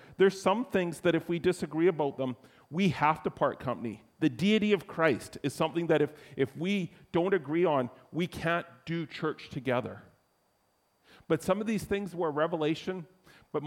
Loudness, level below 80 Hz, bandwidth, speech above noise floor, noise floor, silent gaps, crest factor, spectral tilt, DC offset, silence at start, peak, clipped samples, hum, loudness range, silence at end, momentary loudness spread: -30 LUFS; -64 dBFS; 16 kHz; 42 dB; -72 dBFS; none; 20 dB; -6 dB/octave; under 0.1%; 0 s; -12 dBFS; under 0.1%; none; 5 LU; 0 s; 10 LU